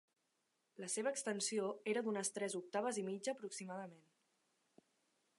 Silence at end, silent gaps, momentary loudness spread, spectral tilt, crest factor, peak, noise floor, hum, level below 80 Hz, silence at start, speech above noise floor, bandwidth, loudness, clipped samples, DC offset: 1.4 s; none; 9 LU; -3 dB/octave; 18 dB; -26 dBFS; -85 dBFS; none; under -90 dBFS; 0.8 s; 43 dB; 11.5 kHz; -42 LUFS; under 0.1%; under 0.1%